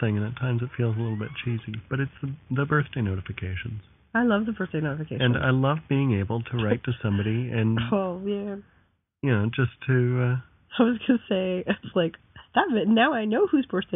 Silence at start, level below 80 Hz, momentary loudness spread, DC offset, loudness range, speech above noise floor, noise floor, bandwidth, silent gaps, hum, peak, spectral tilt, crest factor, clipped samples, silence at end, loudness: 0 s; -54 dBFS; 9 LU; under 0.1%; 4 LU; 19 dB; -44 dBFS; 3.9 kHz; none; none; -8 dBFS; -5 dB/octave; 18 dB; under 0.1%; 0 s; -26 LUFS